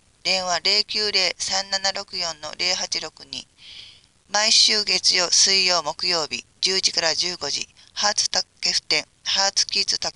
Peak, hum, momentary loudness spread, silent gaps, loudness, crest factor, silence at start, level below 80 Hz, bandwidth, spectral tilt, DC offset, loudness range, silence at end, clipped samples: -4 dBFS; none; 12 LU; none; -19 LUFS; 20 dB; 0.25 s; -60 dBFS; 11.5 kHz; 0.5 dB/octave; under 0.1%; 6 LU; 0.05 s; under 0.1%